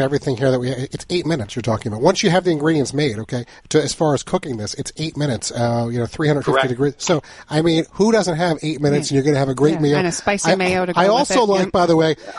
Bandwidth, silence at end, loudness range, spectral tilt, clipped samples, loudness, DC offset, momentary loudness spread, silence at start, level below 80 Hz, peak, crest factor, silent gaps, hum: 11.5 kHz; 0 s; 4 LU; -5 dB/octave; under 0.1%; -18 LUFS; under 0.1%; 8 LU; 0 s; -48 dBFS; 0 dBFS; 18 dB; none; none